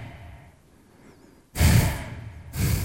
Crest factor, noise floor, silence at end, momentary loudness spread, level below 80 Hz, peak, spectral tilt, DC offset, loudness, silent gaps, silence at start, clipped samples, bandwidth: 20 dB; -55 dBFS; 0 s; 24 LU; -32 dBFS; -6 dBFS; -5 dB/octave; under 0.1%; -23 LUFS; none; 0 s; under 0.1%; 16 kHz